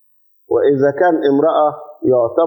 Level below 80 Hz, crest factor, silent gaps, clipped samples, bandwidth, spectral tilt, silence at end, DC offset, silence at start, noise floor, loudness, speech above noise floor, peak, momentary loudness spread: -62 dBFS; 12 dB; none; under 0.1%; 19 kHz; -8.5 dB/octave; 0 s; under 0.1%; 0.5 s; -52 dBFS; -15 LUFS; 39 dB; -2 dBFS; 6 LU